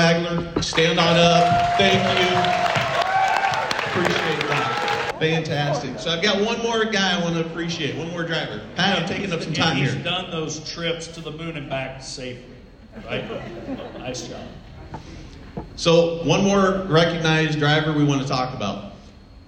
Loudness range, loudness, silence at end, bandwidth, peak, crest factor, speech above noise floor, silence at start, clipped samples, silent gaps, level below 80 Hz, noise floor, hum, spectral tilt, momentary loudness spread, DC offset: 13 LU; -21 LUFS; 0.1 s; 16 kHz; -4 dBFS; 16 dB; 23 dB; 0 s; under 0.1%; none; -46 dBFS; -44 dBFS; none; -4.5 dB/octave; 16 LU; under 0.1%